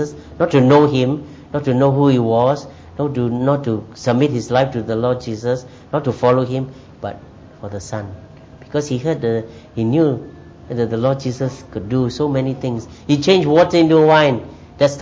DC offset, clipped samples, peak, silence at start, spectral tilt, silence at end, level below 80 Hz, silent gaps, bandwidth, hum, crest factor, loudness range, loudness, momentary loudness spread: under 0.1%; under 0.1%; 0 dBFS; 0 s; -7 dB/octave; 0 s; -46 dBFS; none; 7.8 kHz; none; 16 dB; 7 LU; -17 LUFS; 17 LU